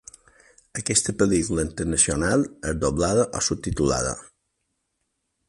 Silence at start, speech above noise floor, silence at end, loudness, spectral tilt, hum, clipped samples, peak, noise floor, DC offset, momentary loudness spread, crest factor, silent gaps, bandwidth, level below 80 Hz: 0.75 s; 53 dB; 1.25 s; -23 LUFS; -4 dB/octave; none; under 0.1%; -4 dBFS; -76 dBFS; under 0.1%; 8 LU; 20 dB; none; 11.5 kHz; -40 dBFS